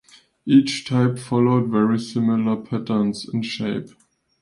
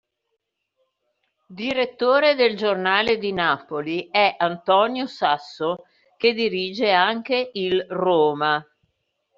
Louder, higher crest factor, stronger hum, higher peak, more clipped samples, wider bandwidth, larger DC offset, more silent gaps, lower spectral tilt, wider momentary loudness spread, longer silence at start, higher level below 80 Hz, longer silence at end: about the same, -21 LUFS vs -21 LUFS; about the same, 18 dB vs 18 dB; neither; about the same, -4 dBFS vs -4 dBFS; neither; first, 11.5 kHz vs 7.4 kHz; neither; neither; first, -6.5 dB/octave vs -1.5 dB/octave; about the same, 9 LU vs 8 LU; second, 0.45 s vs 1.5 s; about the same, -60 dBFS vs -64 dBFS; second, 0.55 s vs 0.75 s